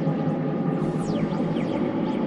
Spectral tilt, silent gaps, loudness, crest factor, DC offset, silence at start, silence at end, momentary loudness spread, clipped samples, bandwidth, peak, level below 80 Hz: -8.5 dB/octave; none; -26 LUFS; 12 dB; under 0.1%; 0 s; 0 s; 1 LU; under 0.1%; 11 kHz; -12 dBFS; -54 dBFS